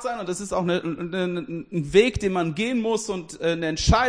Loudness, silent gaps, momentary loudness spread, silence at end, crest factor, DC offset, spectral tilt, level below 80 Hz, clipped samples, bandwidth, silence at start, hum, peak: -24 LUFS; none; 10 LU; 0 s; 20 dB; under 0.1%; -5 dB/octave; -36 dBFS; under 0.1%; 10.5 kHz; 0 s; none; -4 dBFS